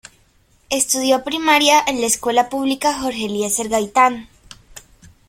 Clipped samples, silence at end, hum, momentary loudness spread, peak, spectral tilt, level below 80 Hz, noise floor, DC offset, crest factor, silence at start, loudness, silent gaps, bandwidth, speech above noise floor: under 0.1%; 0.5 s; none; 9 LU; 0 dBFS; -1.5 dB/octave; -52 dBFS; -56 dBFS; under 0.1%; 18 dB; 0.7 s; -17 LUFS; none; 16.5 kHz; 39 dB